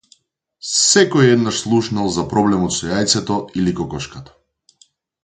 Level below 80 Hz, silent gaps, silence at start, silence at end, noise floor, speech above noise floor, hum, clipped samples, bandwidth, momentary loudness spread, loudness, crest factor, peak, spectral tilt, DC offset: -46 dBFS; none; 0.65 s; 1 s; -59 dBFS; 42 dB; none; under 0.1%; 9.6 kHz; 13 LU; -16 LUFS; 18 dB; 0 dBFS; -4 dB/octave; under 0.1%